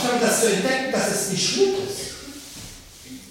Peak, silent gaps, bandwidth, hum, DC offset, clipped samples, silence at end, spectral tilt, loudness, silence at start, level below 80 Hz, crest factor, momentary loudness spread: -6 dBFS; none; 16.5 kHz; none; under 0.1%; under 0.1%; 0 s; -2.5 dB/octave; -21 LUFS; 0 s; -54 dBFS; 18 dB; 21 LU